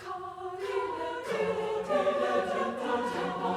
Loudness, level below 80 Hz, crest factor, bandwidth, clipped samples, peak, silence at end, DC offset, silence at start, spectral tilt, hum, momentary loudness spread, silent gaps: -31 LUFS; -66 dBFS; 16 dB; 14 kHz; under 0.1%; -16 dBFS; 0 s; under 0.1%; 0 s; -5 dB/octave; none; 9 LU; none